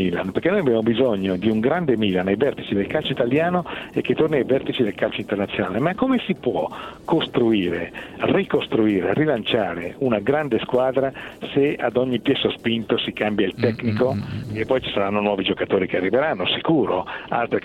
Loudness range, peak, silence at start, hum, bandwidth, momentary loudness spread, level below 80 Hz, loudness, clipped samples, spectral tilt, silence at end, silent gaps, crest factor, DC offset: 1 LU; -6 dBFS; 0 s; none; 13 kHz; 6 LU; -52 dBFS; -21 LUFS; under 0.1%; -7.5 dB/octave; 0.05 s; none; 16 dB; under 0.1%